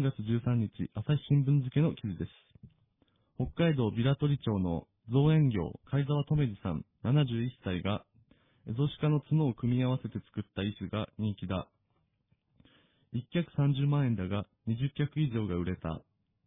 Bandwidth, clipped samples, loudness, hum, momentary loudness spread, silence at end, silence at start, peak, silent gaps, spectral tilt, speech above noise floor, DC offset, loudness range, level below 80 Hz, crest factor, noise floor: 3.9 kHz; under 0.1%; -32 LUFS; none; 10 LU; 0.45 s; 0 s; -16 dBFS; none; -11.5 dB/octave; 45 dB; under 0.1%; 5 LU; -56 dBFS; 16 dB; -76 dBFS